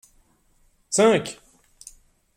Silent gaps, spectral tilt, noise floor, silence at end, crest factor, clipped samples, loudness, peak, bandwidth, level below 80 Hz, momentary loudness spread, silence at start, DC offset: none; -3.5 dB/octave; -62 dBFS; 1.05 s; 22 dB; under 0.1%; -20 LUFS; -4 dBFS; 15 kHz; -62 dBFS; 27 LU; 0.9 s; under 0.1%